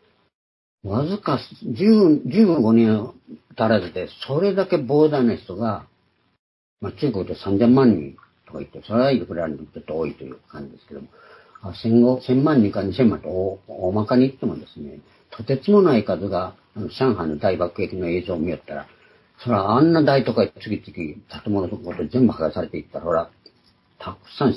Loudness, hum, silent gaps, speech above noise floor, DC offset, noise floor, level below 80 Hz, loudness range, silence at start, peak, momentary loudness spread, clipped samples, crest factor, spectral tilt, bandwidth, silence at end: -20 LUFS; none; 6.39-6.77 s; 29 dB; under 0.1%; -49 dBFS; -58 dBFS; 6 LU; 0.85 s; -4 dBFS; 20 LU; under 0.1%; 18 dB; -9.5 dB/octave; 11 kHz; 0 s